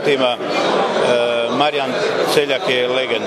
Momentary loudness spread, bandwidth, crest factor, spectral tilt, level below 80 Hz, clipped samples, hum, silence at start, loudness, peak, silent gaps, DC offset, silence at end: 2 LU; 15 kHz; 16 dB; -3.5 dB/octave; -66 dBFS; under 0.1%; none; 0 s; -17 LUFS; 0 dBFS; none; under 0.1%; 0 s